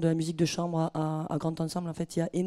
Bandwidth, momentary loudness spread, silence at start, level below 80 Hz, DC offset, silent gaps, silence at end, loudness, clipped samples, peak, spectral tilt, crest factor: 13.5 kHz; 5 LU; 0 s; -62 dBFS; under 0.1%; none; 0 s; -31 LUFS; under 0.1%; -14 dBFS; -6.5 dB/octave; 16 dB